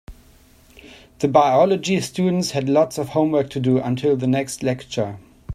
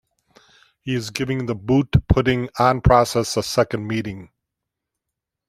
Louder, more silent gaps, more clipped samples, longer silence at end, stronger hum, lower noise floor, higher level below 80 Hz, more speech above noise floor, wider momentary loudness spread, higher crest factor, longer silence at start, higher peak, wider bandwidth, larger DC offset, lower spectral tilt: about the same, -20 LUFS vs -20 LUFS; neither; neither; second, 0 s vs 1.25 s; neither; second, -51 dBFS vs -83 dBFS; second, -52 dBFS vs -36 dBFS; second, 32 dB vs 64 dB; about the same, 9 LU vs 11 LU; about the same, 20 dB vs 20 dB; second, 0.1 s vs 0.85 s; about the same, 0 dBFS vs -2 dBFS; about the same, 15 kHz vs 15 kHz; neither; about the same, -6 dB/octave vs -6 dB/octave